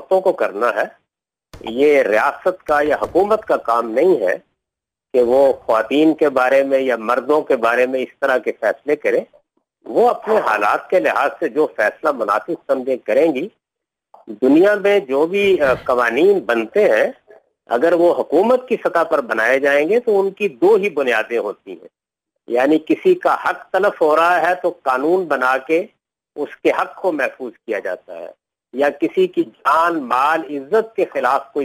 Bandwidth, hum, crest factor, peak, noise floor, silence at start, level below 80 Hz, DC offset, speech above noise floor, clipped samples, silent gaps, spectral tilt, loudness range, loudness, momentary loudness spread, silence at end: 16 kHz; none; 12 dB; -6 dBFS; -84 dBFS; 0 s; -58 dBFS; under 0.1%; 68 dB; under 0.1%; none; -5.5 dB/octave; 4 LU; -17 LUFS; 9 LU; 0 s